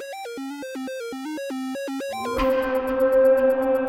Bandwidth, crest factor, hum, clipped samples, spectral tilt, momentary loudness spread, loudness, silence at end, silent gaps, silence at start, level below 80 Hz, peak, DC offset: 17 kHz; 14 dB; none; under 0.1%; -4.5 dB/octave; 15 LU; -24 LUFS; 0 s; none; 0 s; -46 dBFS; -10 dBFS; under 0.1%